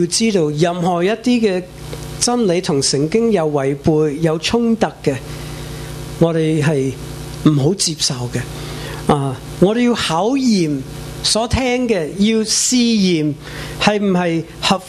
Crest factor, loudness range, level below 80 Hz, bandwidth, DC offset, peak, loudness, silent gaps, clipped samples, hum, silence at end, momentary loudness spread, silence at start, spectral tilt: 16 dB; 2 LU; -38 dBFS; 14 kHz; under 0.1%; 0 dBFS; -16 LUFS; none; under 0.1%; none; 0 s; 13 LU; 0 s; -4.5 dB/octave